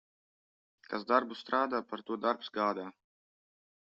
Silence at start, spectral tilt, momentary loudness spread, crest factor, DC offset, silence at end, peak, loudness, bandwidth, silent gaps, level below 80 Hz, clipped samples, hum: 0.9 s; -2 dB/octave; 11 LU; 24 dB; under 0.1%; 1.05 s; -12 dBFS; -34 LUFS; 7.4 kHz; none; -82 dBFS; under 0.1%; none